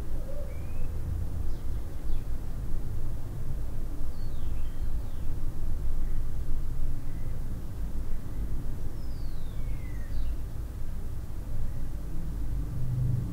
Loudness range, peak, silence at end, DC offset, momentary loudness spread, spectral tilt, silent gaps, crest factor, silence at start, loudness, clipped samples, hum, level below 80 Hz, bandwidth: 1 LU; -14 dBFS; 0 s; under 0.1%; 4 LU; -7.5 dB/octave; none; 12 dB; 0 s; -37 LUFS; under 0.1%; none; -30 dBFS; 2.6 kHz